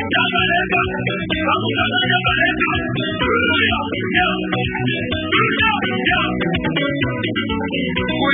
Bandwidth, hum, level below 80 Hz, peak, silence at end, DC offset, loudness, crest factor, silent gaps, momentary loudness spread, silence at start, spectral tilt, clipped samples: 3.9 kHz; none; -38 dBFS; -4 dBFS; 0 s; under 0.1%; -17 LUFS; 14 dB; none; 5 LU; 0 s; -10.5 dB/octave; under 0.1%